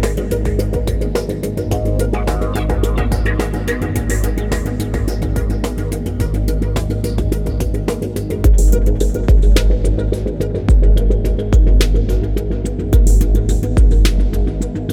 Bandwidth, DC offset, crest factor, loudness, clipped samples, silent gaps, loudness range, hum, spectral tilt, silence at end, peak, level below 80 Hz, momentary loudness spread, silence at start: 15 kHz; under 0.1%; 14 dB; -17 LUFS; under 0.1%; none; 4 LU; none; -6.5 dB/octave; 0 s; 0 dBFS; -14 dBFS; 7 LU; 0 s